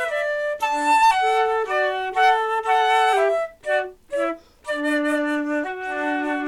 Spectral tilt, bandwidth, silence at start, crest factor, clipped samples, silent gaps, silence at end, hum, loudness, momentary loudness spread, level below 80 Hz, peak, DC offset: -2 dB/octave; 16.5 kHz; 0 s; 14 dB; under 0.1%; none; 0 s; none; -21 LUFS; 9 LU; -58 dBFS; -6 dBFS; under 0.1%